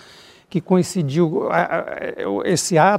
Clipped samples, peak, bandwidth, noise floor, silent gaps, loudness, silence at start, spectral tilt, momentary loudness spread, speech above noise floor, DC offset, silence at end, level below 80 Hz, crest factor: under 0.1%; -2 dBFS; 15.5 kHz; -46 dBFS; none; -20 LUFS; 0.55 s; -5.5 dB/octave; 9 LU; 28 dB; under 0.1%; 0 s; -60 dBFS; 18 dB